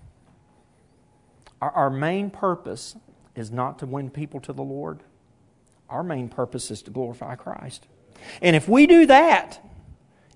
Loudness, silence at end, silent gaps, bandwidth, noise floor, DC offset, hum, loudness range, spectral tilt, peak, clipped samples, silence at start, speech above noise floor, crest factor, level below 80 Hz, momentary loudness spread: -20 LUFS; 0.8 s; none; 11 kHz; -60 dBFS; under 0.1%; none; 15 LU; -6 dB/octave; 0 dBFS; under 0.1%; 1.6 s; 39 dB; 22 dB; -56 dBFS; 24 LU